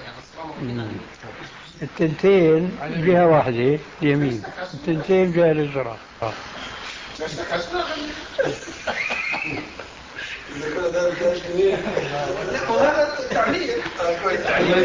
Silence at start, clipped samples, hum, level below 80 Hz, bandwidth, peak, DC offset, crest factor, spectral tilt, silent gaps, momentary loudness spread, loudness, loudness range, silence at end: 0 s; under 0.1%; none; -50 dBFS; 7.6 kHz; -6 dBFS; under 0.1%; 16 dB; -6 dB/octave; none; 16 LU; -22 LUFS; 7 LU; 0 s